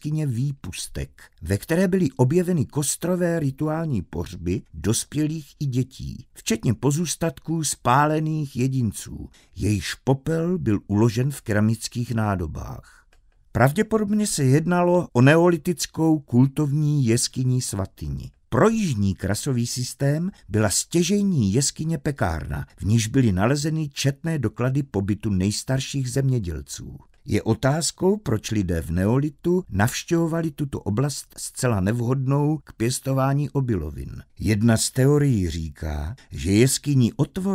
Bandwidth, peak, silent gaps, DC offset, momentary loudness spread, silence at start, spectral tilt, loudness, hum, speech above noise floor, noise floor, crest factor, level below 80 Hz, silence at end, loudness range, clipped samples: 16 kHz; 0 dBFS; none; under 0.1%; 11 LU; 0.05 s; -5.5 dB/octave; -23 LUFS; none; 34 dB; -57 dBFS; 22 dB; -44 dBFS; 0 s; 5 LU; under 0.1%